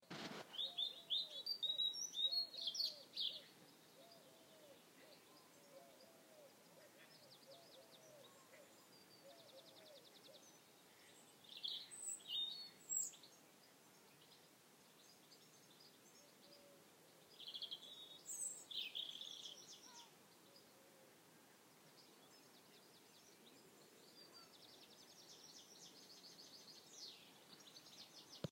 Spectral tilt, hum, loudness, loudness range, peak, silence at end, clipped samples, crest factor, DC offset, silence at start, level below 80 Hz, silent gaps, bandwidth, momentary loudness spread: -0.5 dB/octave; none; -46 LUFS; 22 LU; -30 dBFS; 0 s; under 0.1%; 24 dB; under 0.1%; 0 s; under -90 dBFS; none; 16 kHz; 23 LU